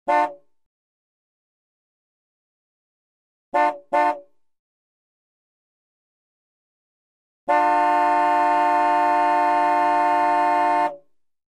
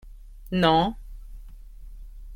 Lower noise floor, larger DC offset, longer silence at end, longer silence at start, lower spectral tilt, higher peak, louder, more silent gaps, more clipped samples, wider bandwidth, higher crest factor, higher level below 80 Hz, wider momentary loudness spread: first, -50 dBFS vs -42 dBFS; first, 0.1% vs under 0.1%; first, 0.55 s vs 0 s; about the same, 0.05 s vs 0.05 s; second, -4 dB/octave vs -7 dB/octave; about the same, -8 dBFS vs -6 dBFS; first, -20 LUFS vs -23 LUFS; first, 0.66-3.52 s, 4.59-7.47 s vs none; neither; second, 11 kHz vs 16.5 kHz; second, 14 dB vs 22 dB; second, -82 dBFS vs -40 dBFS; second, 5 LU vs 26 LU